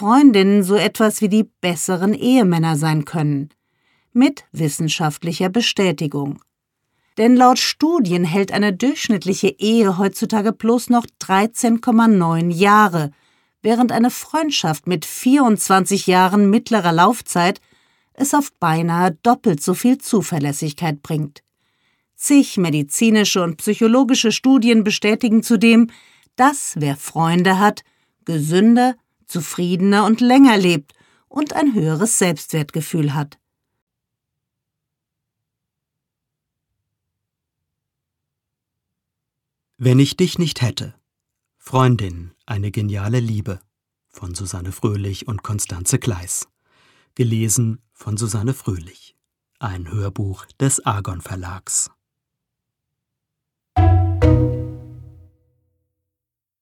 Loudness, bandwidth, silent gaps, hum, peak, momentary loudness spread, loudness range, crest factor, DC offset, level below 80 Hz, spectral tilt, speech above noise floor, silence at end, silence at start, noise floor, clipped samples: -17 LUFS; 18 kHz; 33.82-33.87 s; none; -2 dBFS; 14 LU; 8 LU; 16 dB; under 0.1%; -40 dBFS; -5 dB/octave; 69 dB; 1.6 s; 0 s; -85 dBFS; under 0.1%